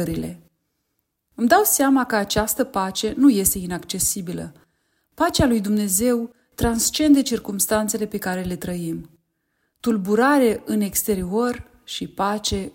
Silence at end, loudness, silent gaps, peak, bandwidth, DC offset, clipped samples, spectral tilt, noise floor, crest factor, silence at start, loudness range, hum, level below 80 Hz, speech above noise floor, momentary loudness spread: 0.05 s; -20 LUFS; none; -2 dBFS; 16.5 kHz; under 0.1%; under 0.1%; -4 dB/octave; -75 dBFS; 18 dB; 0 s; 3 LU; none; -42 dBFS; 54 dB; 14 LU